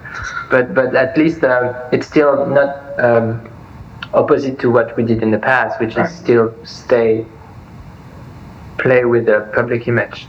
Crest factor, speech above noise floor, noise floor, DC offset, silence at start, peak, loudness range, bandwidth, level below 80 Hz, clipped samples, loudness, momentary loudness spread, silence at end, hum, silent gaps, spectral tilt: 16 dB; 21 dB; -36 dBFS; under 0.1%; 0 s; 0 dBFS; 3 LU; 7.8 kHz; -46 dBFS; under 0.1%; -15 LUFS; 12 LU; 0 s; none; none; -7.5 dB/octave